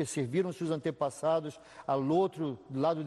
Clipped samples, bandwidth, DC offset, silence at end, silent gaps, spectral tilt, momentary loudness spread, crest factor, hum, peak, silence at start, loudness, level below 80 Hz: under 0.1%; 12.5 kHz; under 0.1%; 0 s; none; -6.5 dB/octave; 8 LU; 14 dB; none; -18 dBFS; 0 s; -32 LUFS; -72 dBFS